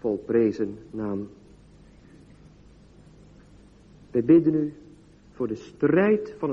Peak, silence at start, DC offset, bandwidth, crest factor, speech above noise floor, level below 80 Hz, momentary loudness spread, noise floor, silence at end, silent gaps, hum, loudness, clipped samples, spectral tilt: -8 dBFS; 0.05 s; under 0.1%; 7 kHz; 20 dB; 29 dB; -56 dBFS; 14 LU; -52 dBFS; 0 s; none; none; -24 LUFS; under 0.1%; -9 dB/octave